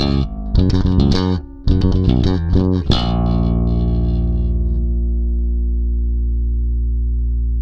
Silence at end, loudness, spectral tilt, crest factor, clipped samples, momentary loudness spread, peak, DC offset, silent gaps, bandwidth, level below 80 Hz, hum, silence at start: 0 s; -18 LUFS; -8.5 dB/octave; 16 dB; under 0.1%; 5 LU; 0 dBFS; under 0.1%; none; 6.6 kHz; -18 dBFS; 60 Hz at -40 dBFS; 0 s